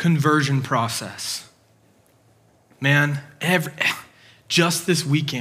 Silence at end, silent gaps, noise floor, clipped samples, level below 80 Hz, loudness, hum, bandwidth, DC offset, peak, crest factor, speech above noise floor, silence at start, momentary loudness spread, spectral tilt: 0 s; none; -58 dBFS; under 0.1%; -70 dBFS; -21 LUFS; none; 16 kHz; under 0.1%; -2 dBFS; 20 dB; 37 dB; 0 s; 10 LU; -4.5 dB/octave